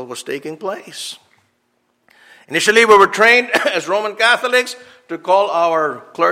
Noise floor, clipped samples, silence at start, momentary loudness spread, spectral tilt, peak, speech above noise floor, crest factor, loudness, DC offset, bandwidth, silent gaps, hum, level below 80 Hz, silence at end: -65 dBFS; under 0.1%; 0 s; 18 LU; -2 dB/octave; 0 dBFS; 50 dB; 16 dB; -14 LUFS; under 0.1%; 16 kHz; none; none; -62 dBFS; 0 s